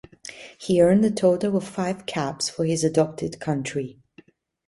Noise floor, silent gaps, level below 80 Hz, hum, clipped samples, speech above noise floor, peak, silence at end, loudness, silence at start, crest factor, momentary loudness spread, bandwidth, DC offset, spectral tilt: -55 dBFS; none; -58 dBFS; none; under 0.1%; 32 dB; -6 dBFS; 0.75 s; -23 LUFS; 0.3 s; 18 dB; 19 LU; 11.5 kHz; under 0.1%; -5.5 dB/octave